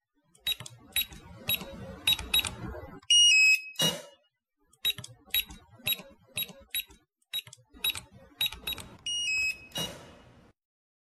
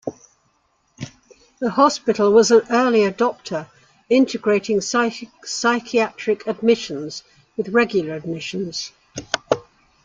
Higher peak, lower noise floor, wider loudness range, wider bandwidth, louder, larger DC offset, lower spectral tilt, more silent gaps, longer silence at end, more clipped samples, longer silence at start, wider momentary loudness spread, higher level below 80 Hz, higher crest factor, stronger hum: second, -10 dBFS vs -2 dBFS; first, -74 dBFS vs -65 dBFS; first, 10 LU vs 5 LU; first, 14.5 kHz vs 9.2 kHz; second, -27 LUFS vs -20 LUFS; neither; second, 0 dB/octave vs -4 dB/octave; neither; first, 1.05 s vs 0.45 s; neither; first, 0.45 s vs 0.05 s; about the same, 18 LU vs 18 LU; first, -56 dBFS vs -62 dBFS; about the same, 22 dB vs 18 dB; neither